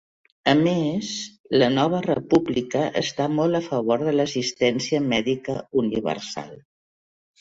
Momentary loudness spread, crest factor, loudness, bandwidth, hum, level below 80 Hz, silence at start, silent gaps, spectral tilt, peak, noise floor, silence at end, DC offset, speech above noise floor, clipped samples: 8 LU; 20 dB; -23 LUFS; 7.8 kHz; none; -58 dBFS; 0.45 s; 1.40-1.44 s; -5.5 dB/octave; -4 dBFS; under -90 dBFS; 0.8 s; under 0.1%; over 68 dB; under 0.1%